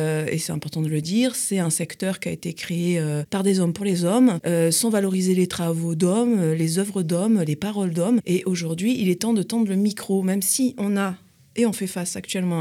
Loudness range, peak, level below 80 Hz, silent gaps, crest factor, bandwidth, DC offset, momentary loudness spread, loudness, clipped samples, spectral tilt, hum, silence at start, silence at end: 3 LU; -6 dBFS; -64 dBFS; none; 16 dB; 16.5 kHz; under 0.1%; 7 LU; -22 LUFS; under 0.1%; -5.5 dB/octave; none; 0 s; 0 s